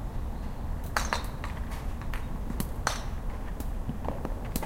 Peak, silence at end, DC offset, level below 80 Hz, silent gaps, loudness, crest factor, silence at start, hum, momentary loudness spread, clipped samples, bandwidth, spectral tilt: -6 dBFS; 0 s; under 0.1%; -34 dBFS; none; -35 LUFS; 26 dB; 0 s; none; 6 LU; under 0.1%; 17 kHz; -4.5 dB/octave